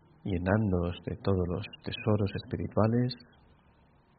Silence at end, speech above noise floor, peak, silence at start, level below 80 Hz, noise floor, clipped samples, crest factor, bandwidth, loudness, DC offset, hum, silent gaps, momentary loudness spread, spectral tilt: 1 s; 33 dB; -10 dBFS; 0.25 s; -56 dBFS; -63 dBFS; under 0.1%; 22 dB; 4.9 kHz; -31 LUFS; under 0.1%; none; none; 8 LU; -7 dB/octave